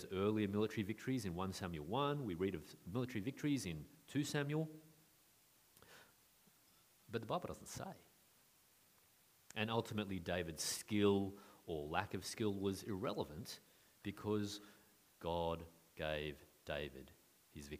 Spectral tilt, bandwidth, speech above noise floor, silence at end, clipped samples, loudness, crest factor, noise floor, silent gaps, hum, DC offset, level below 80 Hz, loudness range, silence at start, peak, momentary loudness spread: -5 dB/octave; 15.5 kHz; 30 dB; 0 s; under 0.1%; -43 LUFS; 24 dB; -72 dBFS; none; none; under 0.1%; -68 dBFS; 10 LU; 0 s; -20 dBFS; 16 LU